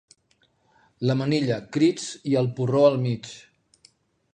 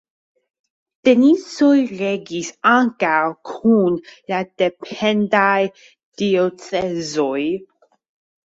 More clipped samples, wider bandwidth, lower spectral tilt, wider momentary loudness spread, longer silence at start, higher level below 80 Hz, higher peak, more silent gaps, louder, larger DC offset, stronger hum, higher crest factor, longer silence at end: neither; first, 9.6 kHz vs 8 kHz; about the same, -6.5 dB/octave vs -5.5 dB/octave; first, 12 LU vs 9 LU; about the same, 1 s vs 1.05 s; about the same, -66 dBFS vs -62 dBFS; second, -6 dBFS vs -2 dBFS; second, none vs 6.03-6.12 s; second, -23 LUFS vs -18 LUFS; neither; neither; about the same, 20 dB vs 16 dB; first, 0.95 s vs 0.8 s